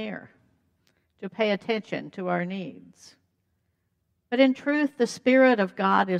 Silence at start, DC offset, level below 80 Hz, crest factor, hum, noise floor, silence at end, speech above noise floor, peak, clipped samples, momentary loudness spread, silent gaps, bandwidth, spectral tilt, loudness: 0 s; under 0.1%; -78 dBFS; 18 dB; none; -75 dBFS; 0 s; 50 dB; -8 dBFS; under 0.1%; 18 LU; none; 10.5 kHz; -6 dB/octave; -24 LUFS